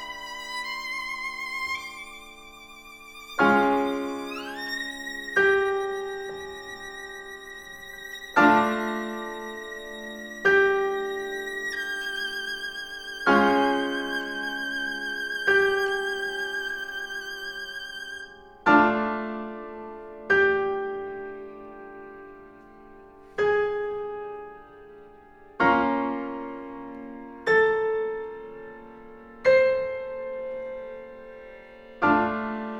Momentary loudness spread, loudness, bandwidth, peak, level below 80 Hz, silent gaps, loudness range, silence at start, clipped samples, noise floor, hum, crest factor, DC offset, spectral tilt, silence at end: 22 LU; -26 LUFS; 18.5 kHz; -4 dBFS; -58 dBFS; none; 5 LU; 0 s; under 0.1%; -50 dBFS; none; 24 dB; under 0.1%; -4.5 dB/octave; 0 s